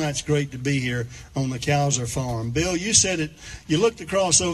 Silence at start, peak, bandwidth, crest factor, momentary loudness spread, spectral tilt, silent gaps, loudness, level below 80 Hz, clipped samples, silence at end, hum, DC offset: 0 s; -4 dBFS; 13.5 kHz; 18 dB; 11 LU; -3.5 dB/octave; none; -22 LUFS; -44 dBFS; under 0.1%; 0 s; none; under 0.1%